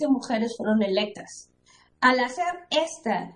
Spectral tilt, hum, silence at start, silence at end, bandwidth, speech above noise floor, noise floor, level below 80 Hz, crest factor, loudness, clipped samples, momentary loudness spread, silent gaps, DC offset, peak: -4 dB/octave; none; 0 s; 0.05 s; 10.5 kHz; 35 dB; -60 dBFS; -66 dBFS; 20 dB; -25 LUFS; under 0.1%; 14 LU; none; under 0.1%; -4 dBFS